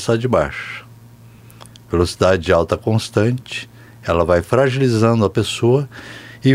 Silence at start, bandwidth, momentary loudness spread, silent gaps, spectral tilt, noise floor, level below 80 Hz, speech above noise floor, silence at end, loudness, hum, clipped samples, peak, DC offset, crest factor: 0 s; 15 kHz; 15 LU; none; -6.5 dB/octave; -42 dBFS; -40 dBFS; 26 dB; 0 s; -17 LUFS; none; under 0.1%; 0 dBFS; under 0.1%; 16 dB